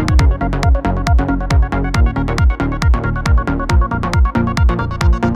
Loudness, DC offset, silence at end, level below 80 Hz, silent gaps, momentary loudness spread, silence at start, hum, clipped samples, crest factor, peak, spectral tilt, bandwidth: -16 LUFS; under 0.1%; 0 s; -16 dBFS; none; 2 LU; 0 s; none; under 0.1%; 12 dB; -2 dBFS; -7 dB/octave; 11 kHz